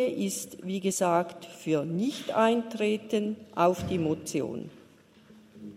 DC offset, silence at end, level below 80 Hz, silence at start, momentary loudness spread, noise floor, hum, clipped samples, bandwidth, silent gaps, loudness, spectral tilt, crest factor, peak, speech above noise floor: under 0.1%; 0 s; -66 dBFS; 0 s; 11 LU; -57 dBFS; none; under 0.1%; 16 kHz; none; -29 LUFS; -5 dB/octave; 20 dB; -10 dBFS; 28 dB